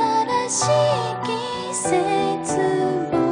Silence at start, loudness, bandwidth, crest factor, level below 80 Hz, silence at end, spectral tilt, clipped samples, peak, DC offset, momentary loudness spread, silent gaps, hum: 0 s; -21 LUFS; 10.5 kHz; 14 dB; -58 dBFS; 0 s; -4 dB/octave; under 0.1%; -8 dBFS; under 0.1%; 7 LU; none; none